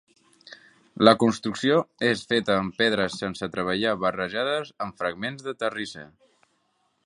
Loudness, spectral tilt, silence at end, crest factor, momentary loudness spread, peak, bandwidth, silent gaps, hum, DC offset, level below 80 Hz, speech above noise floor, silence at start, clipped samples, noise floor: -25 LUFS; -5 dB/octave; 1 s; 24 dB; 12 LU; -2 dBFS; 11 kHz; none; none; under 0.1%; -60 dBFS; 46 dB; 0.5 s; under 0.1%; -71 dBFS